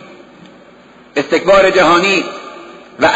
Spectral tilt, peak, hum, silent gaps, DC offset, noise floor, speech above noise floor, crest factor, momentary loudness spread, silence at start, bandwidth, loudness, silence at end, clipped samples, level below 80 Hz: -4 dB/octave; -2 dBFS; none; none; under 0.1%; -42 dBFS; 31 dB; 12 dB; 21 LU; 1.15 s; 8 kHz; -11 LUFS; 0 s; under 0.1%; -44 dBFS